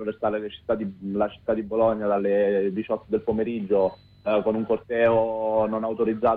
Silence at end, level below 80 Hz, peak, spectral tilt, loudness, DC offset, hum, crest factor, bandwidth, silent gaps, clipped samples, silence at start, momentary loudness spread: 0 s; -56 dBFS; -10 dBFS; -9.5 dB/octave; -25 LUFS; under 0.1%; none; 14 dB; 4.6 kHz; none; under 0.1%; 0 s; 6 LU